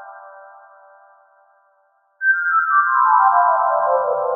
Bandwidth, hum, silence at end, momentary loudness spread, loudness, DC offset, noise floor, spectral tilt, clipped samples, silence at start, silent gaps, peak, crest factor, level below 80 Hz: 1.8 kHz; none; 0 s; 5 LU; -16 LUFS; under 0.1%; -61 dBFS; 10 dB/octave; under 0.1%; 0 s; none; -2 dBFS; 16 dB; under -90 dBFS